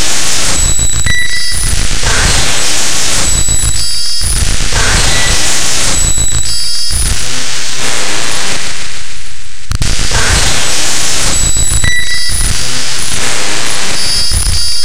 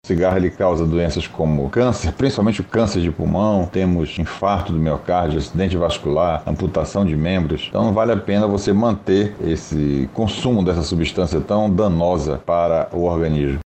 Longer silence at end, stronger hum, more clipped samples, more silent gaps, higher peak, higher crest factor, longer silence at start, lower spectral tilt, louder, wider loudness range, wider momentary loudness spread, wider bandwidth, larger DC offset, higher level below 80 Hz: about the same, 0 s vs 0.05 s; neither; first, 0.3% vs under 0.1%; neither; first, 0 dBFS vs -4 dBFS; second, 6 dB vs 14 dB; about the same, 0 s vs 0.05 s; second, -1.5 dB/octave vs -7 dB/octave; first, -11 LUFS vs -19 LUFS; about the same, 3 LU vs 1 LU; about the same, 6 LU vs 4 LU; first, 16.5 kHz vs 8.8 kHz; neither; first, -18 dBFS vs -34 dBFS